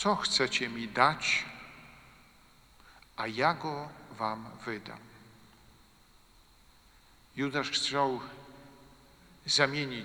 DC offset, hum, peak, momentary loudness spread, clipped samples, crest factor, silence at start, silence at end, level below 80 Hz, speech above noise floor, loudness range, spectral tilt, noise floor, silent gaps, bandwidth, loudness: under 0.1%; none; -6 dBFS; 21 LU; under 0.1%; 28 dB; 0 s; 0 s; -64 dBFS; 30 dB; 11 LU; -3 dB/octave; -61 dBFS; none; over 20 kHz; -30 LUFS